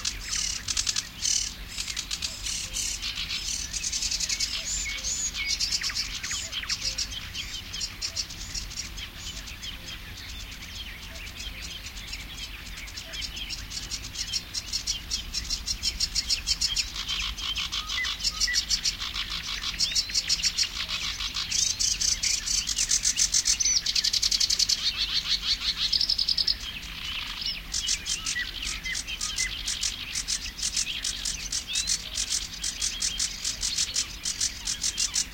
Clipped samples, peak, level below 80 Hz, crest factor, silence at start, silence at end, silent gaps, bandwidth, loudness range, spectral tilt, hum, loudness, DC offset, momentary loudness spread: under 0.1%; -8 dBFS; -44 dBFS; 22 dB; 0 s; 0 s; none; 17 kHz; 12 LU; 1 dB/octave; none; -27 LUFS; under 0.1%; 14 LU